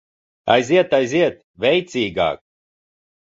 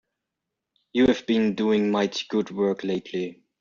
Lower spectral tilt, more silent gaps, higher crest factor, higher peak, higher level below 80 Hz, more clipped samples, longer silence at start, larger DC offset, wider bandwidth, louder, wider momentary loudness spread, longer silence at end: about the same, -5 dB/octave vs -4.5 dB/octave; first, 1.44-1.54 s vs none; about the same, 18 dB vs 16 dB; first, -2 dBFS vs -8 dBFS; about the same, -54 dBFS vs -58 dBFS; neither; second, 0.45 s vs 0.95 s; neither; about the same, 7.8 kHz vs 7.4 kHz; first, -18 LUFS vs -24 LUFS; about the same, 7 LU vs 9 LU; first, 0.85 s vs 0.25 s